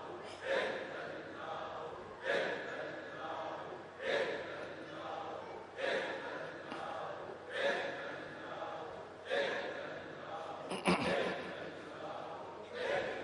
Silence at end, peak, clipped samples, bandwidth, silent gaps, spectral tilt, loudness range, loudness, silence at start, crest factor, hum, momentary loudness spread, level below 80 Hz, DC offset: 0 s; -16 dBFS; under 0.1%; 11 kHz; none; -4.5 dB/octave; 3 LU; -40 LUFS; 0 s; 24 dB; none; 11 LU; -76 dBFS; under 0.1%